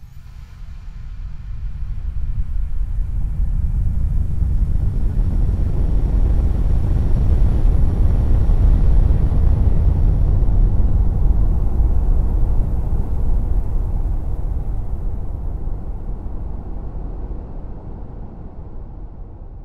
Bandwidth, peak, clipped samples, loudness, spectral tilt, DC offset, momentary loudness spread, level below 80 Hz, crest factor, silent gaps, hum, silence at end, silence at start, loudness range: 2.6 kHz; -4 dBFS; under 0.1%; -21 LUFS; -10 dB/octave; under 0.1%; 18 LU; -18 dBFS; 14 dB; none; none; 0 s; 0 s; 12 LU